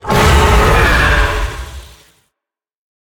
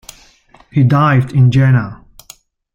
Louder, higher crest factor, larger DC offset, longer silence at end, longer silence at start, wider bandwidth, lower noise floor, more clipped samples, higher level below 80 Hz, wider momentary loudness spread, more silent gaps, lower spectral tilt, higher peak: about the same, -11 LUFS vs -12 LUFS; about the same, 12 dB vs 12 dB; neither; first, 1.2 s vs 0.8 s; second, 0.05 s vs 0.75 s; first, 19.5 kHz vs 9 kHz; first, -83 dBFS vs -47 dBFS; neither; first, -18 dBFS vs -44 dBFS; first, 16 LU vs 8 LU; neither; second, -4.5 dB/octave vs -8 dB/octave; about the same, 0 dBFS vs -2 dBFS